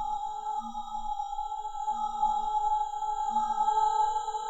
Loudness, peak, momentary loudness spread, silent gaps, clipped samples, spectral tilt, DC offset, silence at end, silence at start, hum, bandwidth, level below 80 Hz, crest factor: -30 LUFS; -16 dBFS; 9 LU; none; under 0.1%; -2 dB/octave; under 0.1%; 0 s; 0 s; none; 8.6 kHz; -50 dBFS; 14 dB